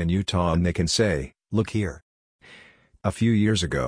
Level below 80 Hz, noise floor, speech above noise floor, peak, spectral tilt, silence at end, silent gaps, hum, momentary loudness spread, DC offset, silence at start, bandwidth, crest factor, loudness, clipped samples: -42 dBFS; -52 dBFS; 30 dB; -8 dBFS; -5.5 dB/octave; 0 s; 2.02-2.39 s; none; 9 LU; under 0.1%; 0 s; 10.5 kHz; 18 dB; -24 LUFS; under 0.1%